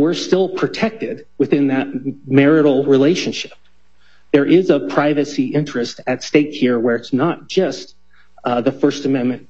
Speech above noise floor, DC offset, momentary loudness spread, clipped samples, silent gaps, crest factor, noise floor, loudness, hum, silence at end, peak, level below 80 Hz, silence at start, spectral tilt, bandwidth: 41 dB; 0.7%; 10 LU; under 0.1%; none; 16 dB; -57 dBFS; -17 LUFS; none; 0.1 s; 0 dBFS; -60 dBFS; 0 s; -6 dB/octave; 8 kHz